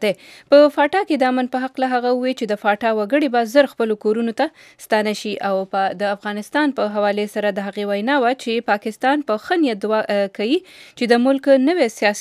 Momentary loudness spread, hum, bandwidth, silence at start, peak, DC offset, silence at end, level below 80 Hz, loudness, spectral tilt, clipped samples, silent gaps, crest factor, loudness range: 8 LU; none; 14.5 kHz; 0 s; -2 dBFS; under 0.1%; 0 s; -70 dBFS; -19 LUFS; -4.5 dB/octave; under 0.1%; none; 18 dB; 3 LU